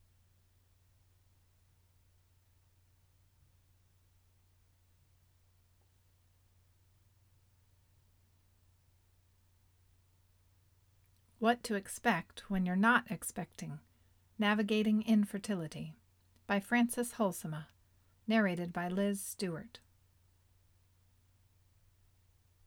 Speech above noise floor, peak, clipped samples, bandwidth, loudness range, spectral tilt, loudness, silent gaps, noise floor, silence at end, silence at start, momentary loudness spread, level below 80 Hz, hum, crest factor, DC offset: 36 dB; -14 dBFS; under 0.1%; 17.5 kHz; 8 LU; -5 dB/octave; -34 LUFS; none; -70 dBFS; 2.9 s; 11.4 s; 16 LU; -70 dBFS; none; 24 dB; under 0.1%